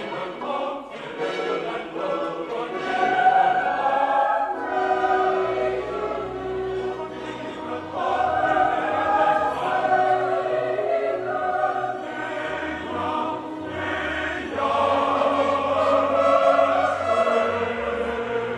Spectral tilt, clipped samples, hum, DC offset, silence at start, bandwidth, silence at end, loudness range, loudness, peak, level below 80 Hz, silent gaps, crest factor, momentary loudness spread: -5 dB/octave; under 0.1%; none; under 0.1%; 0 s; 10 kHz; 0 s; 6 LU; -23 LUFS; -6 dBFS; -54 dBFS; none; 16 dB; 10 LU